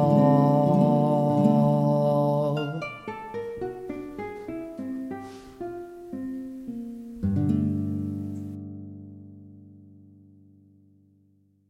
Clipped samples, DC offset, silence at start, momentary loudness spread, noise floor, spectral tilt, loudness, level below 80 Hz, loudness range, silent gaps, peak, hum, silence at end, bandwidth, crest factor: under 0.1%; under 0.1%; 0 s; 18 LU; -63 dBFS; -9.5 dB/octave; -26 LUFS; -58 dBFS; 14 LU; none; -8 dBFS; 50 Hz at -55 dBFS; 1.9 s; 11.5 kHz; 18 dB